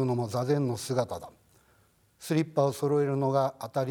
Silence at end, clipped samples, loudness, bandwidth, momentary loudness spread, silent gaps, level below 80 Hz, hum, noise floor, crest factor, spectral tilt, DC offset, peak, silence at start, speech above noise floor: 0 s; under 0.1%; -29 LUFS; 19 kHz; 7 LU; none; -70 dBFS; none; -65 dBFS; 16 dB; -6.5 dB/octave; under 0.1%; -12 dBFS; 0 s; 37 dB